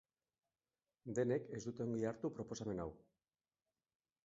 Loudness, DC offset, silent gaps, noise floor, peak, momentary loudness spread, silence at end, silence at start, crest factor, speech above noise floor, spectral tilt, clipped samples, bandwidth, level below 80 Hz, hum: -43 LUFS; under 0.1%; none; under -90 dBFS; -26 dBFS; 9 LU; 1.25 s; 1.05 s; 20 dB; over 48 dB; -7.5 dB/octave; under 0.1%; 7.6 kHz; -72 dBFS; none